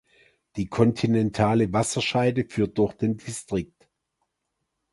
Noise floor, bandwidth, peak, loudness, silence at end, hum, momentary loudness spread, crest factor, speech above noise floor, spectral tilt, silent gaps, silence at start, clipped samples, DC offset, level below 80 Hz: -80 dBFS; 11.5 kHz; -4 dBFS; -24 LUFS; 1.25 s; none; 10 LU; 20 dB; 56 dB; -6 dB/octave; none; 0.55 s; under 0.1%; under 0.1%; -52 dBFS